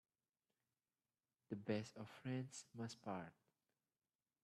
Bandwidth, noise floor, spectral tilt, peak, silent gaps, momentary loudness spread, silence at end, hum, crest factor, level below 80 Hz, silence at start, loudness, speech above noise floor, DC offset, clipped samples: 13 kHz; under -90 dBFS; -6 dB/octave; -30 dBFS; none; 8 LU; 1.15 s; none; 24 dB; -88 dBFS; 1.5 s; -50 LUFS; over 41 dB; under 0.1%; under 0.1%